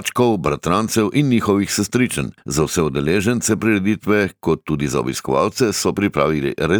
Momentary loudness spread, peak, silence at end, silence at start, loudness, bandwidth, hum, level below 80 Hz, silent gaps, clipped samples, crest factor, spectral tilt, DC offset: 4 LU; -2 dBFS; 0 s; 0 s; -18 LUFS; over 20 kHz; none; -42 dBFS; none; under 0.1%; 14 dB; -5 dB/octave; under 0.1%